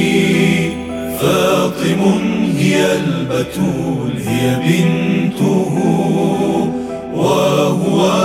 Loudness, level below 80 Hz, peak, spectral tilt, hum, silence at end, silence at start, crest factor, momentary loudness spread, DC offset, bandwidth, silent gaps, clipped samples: -15 LUFS; -46 dBFS; 0 dBFS; -6 dB/octave; none; 0 s; 0 s; 14 dB; 6 LU; under 0.1%; 17 kHz; none; under 0.1%